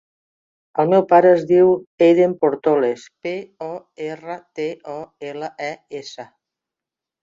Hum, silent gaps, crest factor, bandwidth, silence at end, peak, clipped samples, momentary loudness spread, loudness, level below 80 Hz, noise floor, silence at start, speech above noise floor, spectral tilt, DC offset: none; 1.87-1.98 s; 18 dB; 7.6 kHz; 1 s; -2 dBFS; under 0.1%; 19 LU; -17 LUFS; -64 dBFS; -87 dBFS; 0.75 s; 69 dB; -7 dB/octave; under 0.1%